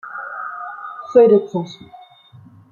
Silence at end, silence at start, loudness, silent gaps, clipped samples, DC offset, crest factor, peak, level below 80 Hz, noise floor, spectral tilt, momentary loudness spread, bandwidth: 1 s; 0.05 s; -17 LUFS; none; under 0.1%; under 0.1%; 18 dB; 0 dBFS; -64 dBFS; -46 dBFS; -7.5 dB/octave; 20 LU; 7 kHz